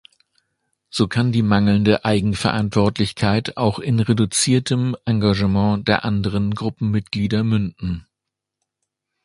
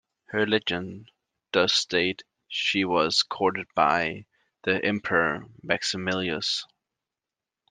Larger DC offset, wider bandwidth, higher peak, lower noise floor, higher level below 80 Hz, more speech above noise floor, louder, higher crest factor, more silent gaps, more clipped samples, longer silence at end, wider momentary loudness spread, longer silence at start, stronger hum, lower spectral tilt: neither; first, 11.5 kHz vs 10 kHz; first, 0 dBFS vs -4 dBFS; second, -83 dBFS vs -89 dBFS; first, -42 dBFS vs -66 dBFS; about the same, 64 dB vs 63 dB; first, -19 LUFS vs -25 LUFS; about the same, 20 dB vs 22 dB; neither; neither; first, 1.25 s vs 1.05 s; second, 6 LU vs 11 LU; first, 0.95 s vs 0.3 s; neither; first, -5.5 dB/octave vs -3.5 dB/octave